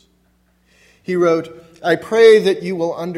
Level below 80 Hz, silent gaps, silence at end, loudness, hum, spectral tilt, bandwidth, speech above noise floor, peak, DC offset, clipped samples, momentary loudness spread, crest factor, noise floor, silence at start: -62 dBFS; none; 0 s; -15 LUFS; none; -5.5 dB/octave; 12 kHz; 44 dB; 0 dBFS; under 0.1%; under 0.1%; 15 LU; 16 dB; -59 dBFS; 1.1 s